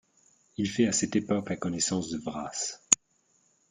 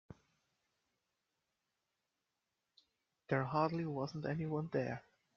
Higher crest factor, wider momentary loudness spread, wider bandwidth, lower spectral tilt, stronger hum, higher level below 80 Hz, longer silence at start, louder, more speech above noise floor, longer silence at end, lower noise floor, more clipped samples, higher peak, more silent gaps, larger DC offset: first, 30 dB vs 22 dB; first, 10 LU vs 6 LU; first, 9.8 kHz vs 6.8 kHz; second, -3.5 dB/octave vs -6.5 dB/octave; neither; first, -64 dBFS vs -76 dBFS; first, 0.6 s vs 0.1 s; first, -28 LUFS vs -39 LUFS; second, 40 dB vs 50 dB; first, 0.75 s vs 0.35 s; second, -70 dBFS vs -88 dBFS; neither; first, -2 dBFS vs -20 dBFS; neither; neither